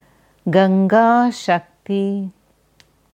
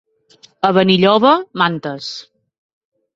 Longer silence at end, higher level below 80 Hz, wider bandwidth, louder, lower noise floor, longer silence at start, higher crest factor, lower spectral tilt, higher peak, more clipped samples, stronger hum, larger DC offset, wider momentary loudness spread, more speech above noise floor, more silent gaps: about the same, 0.85 s vs 0.95 s; second, -64 dBFS vs -58 dBFS; first, 9.2 kHz vs 7.6 kHz; second, -17 LUFS vs -14 LUFS; first, -56 dBFS vs -50 dBFS; second, 0.45 s vs 0.65 s; about the same, 16 dB vs 16 dB; about the same, -7 dB/octave vs -6 dB/octave; about the same, -2 dBFS vs 0 dBFS; neither; neither; neither; second, 13 LU vs 16 LU; first, 40 dB vs 36 dB; neither